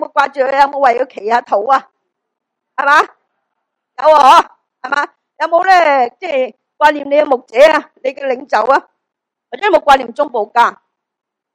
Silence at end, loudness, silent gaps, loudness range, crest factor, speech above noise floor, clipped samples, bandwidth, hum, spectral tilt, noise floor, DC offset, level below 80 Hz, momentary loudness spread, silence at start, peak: 0.85 s; -12 LUFS; none; 3 LU; 14 dB; 66 dB; 1%; 15 kHz; none; -2 dB/octave; -78 dBFS; under 0.1%; -52 dBFS; 11 LU; 0 s; 0 dBFS